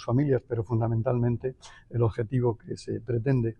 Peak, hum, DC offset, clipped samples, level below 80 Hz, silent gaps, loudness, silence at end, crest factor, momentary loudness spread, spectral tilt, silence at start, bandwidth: -14 dBFS; none; under 0.1%; under 0.1%; -50 dBFS; none; -28 LUFS; 0.05 s; 14 dB; 10 LU; -9 dB/octave; 0 s; 9 kHz